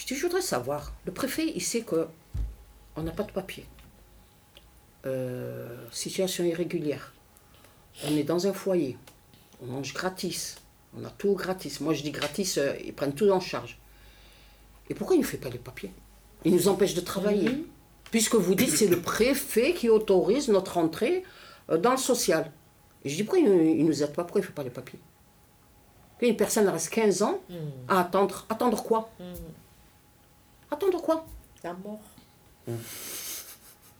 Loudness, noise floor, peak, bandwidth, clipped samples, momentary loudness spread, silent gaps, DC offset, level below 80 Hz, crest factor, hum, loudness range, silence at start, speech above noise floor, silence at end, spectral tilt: -27 LUFS; -59 dBFS; -10 dBFS; over 20 kHz; under 0.1%; 18 LU; none; under 0.1%; -52 dBFS; 18 dB; none; 9 LU; 0 s; 32 dB; 0.3 s; -4.5 dB/octave